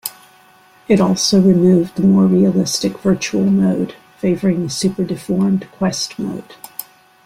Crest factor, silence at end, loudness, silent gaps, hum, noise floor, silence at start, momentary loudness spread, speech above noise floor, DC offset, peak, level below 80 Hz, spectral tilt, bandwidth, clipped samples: 14 dB; 0.45 s; -16 LUFS; none; none; -48 dBFS; 0.05 s; 14 LU; 33 dB; under 0.1%; -2 dBFS; -50 dBFS; -6 dB/octave; 15.5 kHz; under 0.1%